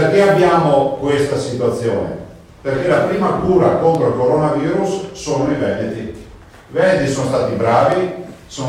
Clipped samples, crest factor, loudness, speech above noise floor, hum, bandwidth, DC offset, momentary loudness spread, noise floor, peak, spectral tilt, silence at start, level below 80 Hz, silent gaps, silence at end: under 0.1%; 16 dB; -16 LUFS; 24 dB; none; 15 kHz; under 0.1%; 12 LU; -39 dBFS; 0 dBFS; -6.5 dB/octave; 0 s; -44 dBFS; none; 0 s